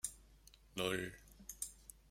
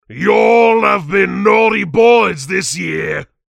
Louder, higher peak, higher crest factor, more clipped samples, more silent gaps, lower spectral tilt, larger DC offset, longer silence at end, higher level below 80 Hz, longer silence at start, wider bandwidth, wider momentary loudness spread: second, -44 LUFS vs -12 LUFS; second, -22 dBFS vs 0 dBFS; first, 24 dB vs 12 dB; neither; neither; second, -2.5 dB/octave vs -4.5 dB/octave; neither; second, 0 s vs 0.25 s; second, -64 dBFS vs -50 dBFS; about the same, 0.05 s vs 0.1 s; first, 16 kHz vs 12.5 kHz; first, 23 LU vs 9 LU